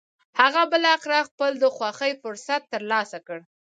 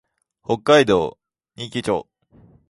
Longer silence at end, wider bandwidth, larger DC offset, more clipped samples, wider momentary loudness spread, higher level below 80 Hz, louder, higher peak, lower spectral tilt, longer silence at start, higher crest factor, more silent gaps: second, 0.4 s vs 0.65 s; second, 9.2 kHz vs 11.5 kHz; neither; neither; second, 14 LU vs 17 LU; second, -84 dBFS vs -54 dBFS; second, -22 LUFS vs -19 LUFS; about the same, -2 dBFS vs -2 dBFS; second, -2 dB/octave vs -5 dB/octave; second, 0.35 s vs 0.5 s; about the same, 22 dB vs 20 dB; first, 1.31-1.38 s vs none